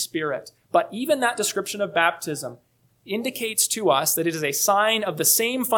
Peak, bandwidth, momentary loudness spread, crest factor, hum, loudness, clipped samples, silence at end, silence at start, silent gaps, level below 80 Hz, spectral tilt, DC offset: -4 dBFS; 19 kHz; 12 LU; 20 dB; none; -22 LUFS; under 0.1%; 0 s; 0 s; none; -72 dBFS; -2 dB/octave; under 0.1%